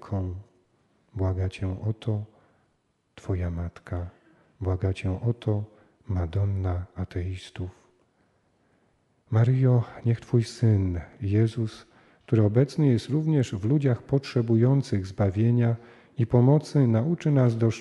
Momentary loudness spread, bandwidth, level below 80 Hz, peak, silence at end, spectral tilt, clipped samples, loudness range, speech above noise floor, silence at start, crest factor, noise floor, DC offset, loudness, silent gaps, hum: 14 LU; 10 kHz; -50 dBFS; -6 dBFS; 0 s; -8.5 dB/octave; under 0.1%; 9 LU; 47 dB; 0.05 s; 18 dB; -71 dBFS; under 0.1%; -26 LUFS; none; none